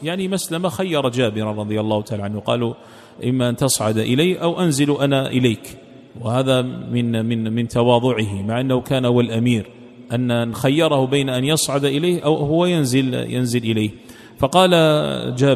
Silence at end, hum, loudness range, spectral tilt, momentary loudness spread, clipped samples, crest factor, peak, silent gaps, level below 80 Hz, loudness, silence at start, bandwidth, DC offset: 0 s; none; 3 LU; -5.5 dB/octave; 7 LU; under 0.1%; 18 dB; 0 dBFS; none; -52 dBFS; -19 LUFS; 0 s; 15 kHz; under 0.1%